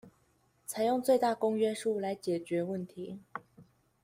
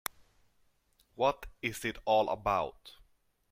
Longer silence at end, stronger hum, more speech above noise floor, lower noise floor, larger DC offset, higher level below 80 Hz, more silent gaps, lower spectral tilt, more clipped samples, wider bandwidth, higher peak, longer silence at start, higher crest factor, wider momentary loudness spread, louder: second, 0.4 s vs 0.6 s; neither; about the same, 39 dB vs 39 dB; about the same, -70 dBFS vs -71 dBFS; neither; second, -76 dBFS vs -58 dBFS; neither; first, -5.5 dB/octave vs -4 dB/octave; neither; about the same, 16 kHz vs 16.5 kHz; about the same, -16 dBFS vs -14 dBFS; second, 0.05 s vs 1.2 s; about the same, 18 dB vs 22 dB; first, 17 LU vs 9 LU; about the same, -32 LUFS vs -33 LUFS